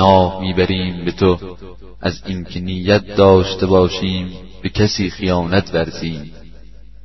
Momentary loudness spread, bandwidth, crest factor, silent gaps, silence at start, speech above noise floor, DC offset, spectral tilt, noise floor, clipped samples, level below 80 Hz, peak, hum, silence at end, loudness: 14 LU; 6.2 kHz; 16 dB; none; 0 s; 24 dB; 1%; -6.5 dB/octave; -40 dBFS; under 0.1%; -38 dBFS; 0 dBFS; none; 0.5 s; -17 LUFS